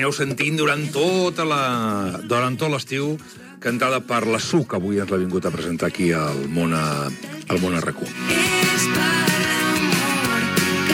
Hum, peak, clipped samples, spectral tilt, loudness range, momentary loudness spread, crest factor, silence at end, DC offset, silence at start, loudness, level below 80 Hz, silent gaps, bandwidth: none; -2 dBFS; under 0.1%; -4 dB/octave; 4 LU; 8 LU; 20 dB; 0 s; under 0.1%; 0 s; -21 LUFS; -54 dBFS; none; 17.5 kHz